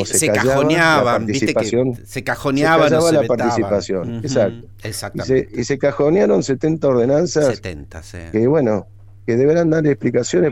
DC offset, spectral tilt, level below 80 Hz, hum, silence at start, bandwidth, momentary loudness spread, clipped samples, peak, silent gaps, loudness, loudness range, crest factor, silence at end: under 0.1%; -5 dB/octave; -44 dBFS; none; 0 s; 16.5 kHz; 12 LU; under 0.1%; -2 dBFS; none; -17 LUFS; 3 LU; 14 dB; 0 s